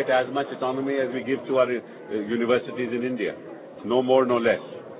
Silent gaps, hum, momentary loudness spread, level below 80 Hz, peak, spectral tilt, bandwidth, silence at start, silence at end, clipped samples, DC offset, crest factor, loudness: none; none; 11 LU; -68 dBFS; -6 dBFS; -9.5 dB/octave; 4 kHz; 0 s; 0 s; under 0.1%; under 0.1%; 18 dB; -25 LUFS